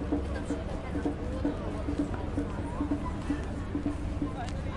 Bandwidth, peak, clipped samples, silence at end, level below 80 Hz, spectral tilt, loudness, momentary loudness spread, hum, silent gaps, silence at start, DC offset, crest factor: 11.5 kHz; -18 dBFS; under 0.1%; 0 s; -38 dBFS; -7.5 dB/octave; -34 LUFS; 2 LU; none; none; 0 s; under 0.1%; 14 dB